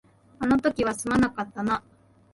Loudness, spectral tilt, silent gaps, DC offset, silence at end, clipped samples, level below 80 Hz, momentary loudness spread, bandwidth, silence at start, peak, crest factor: -26 LUFS; -5.5 dB/octave; none; under 0.1%; 0.55 s; under 0.1%; -50 dBFS; 7 LU; 11.5 kHz; 0.4 s; -10 dBFS; 16 dB